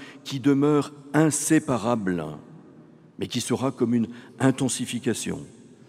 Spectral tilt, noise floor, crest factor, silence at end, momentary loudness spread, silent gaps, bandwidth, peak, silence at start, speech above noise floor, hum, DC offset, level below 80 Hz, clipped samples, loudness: -5 dB/octave; -50 dBFS; 20 dB; 0.4 s; 12 LU; none; 15.5 kHz; -6 dBFS; 0 s; 26 dB; none; under 0.1%; -66 dBFS; under 0.1%; -24 LUFS